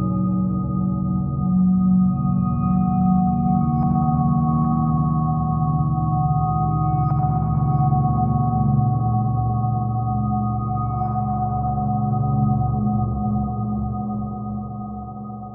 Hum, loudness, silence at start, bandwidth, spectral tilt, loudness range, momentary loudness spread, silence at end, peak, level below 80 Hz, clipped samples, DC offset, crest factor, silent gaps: none; -21 LUFS; 0 s; 2.4 kHz; -16 dB/octave; 3 LU; 6 LU; 0 s; -8 dBFS; -34 dBFS; under 0.1%; under 0.1%; 12 dB; none